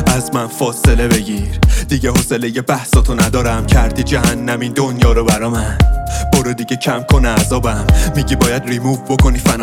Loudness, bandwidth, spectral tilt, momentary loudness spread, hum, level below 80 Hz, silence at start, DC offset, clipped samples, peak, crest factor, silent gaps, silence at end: -14 LUFS; 18 kHz; -5 dB/octave; 5 LU; none; -18 dBFS; 0 s; under 0.1%; under 0.1%; 0 dBFS; 12 dB; none; 0 s